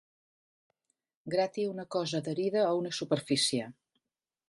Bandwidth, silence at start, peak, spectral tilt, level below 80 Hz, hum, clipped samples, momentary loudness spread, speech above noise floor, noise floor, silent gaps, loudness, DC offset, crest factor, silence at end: 11.5 kHz; 1.25 s; -14 dBFS; -4 dB/octave; -78 dBFS; none; under 0.1%; 7 LU; 57 dB; -88 dBFS; none; -31 LUFS; under 0.1%; 18 dB; 0.75 s